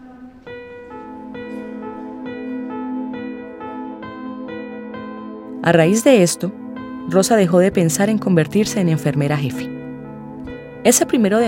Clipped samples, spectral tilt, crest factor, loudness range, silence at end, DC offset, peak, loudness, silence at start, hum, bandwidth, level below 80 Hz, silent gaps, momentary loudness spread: under 0.1%; -5 dB/octave; 18 dB; 13 LU; 0 s; under 0.1%; 0 dBFS; -17 LUFS; 0 s; none; 16.5 kHz; -54 dBFS; none; 19 LU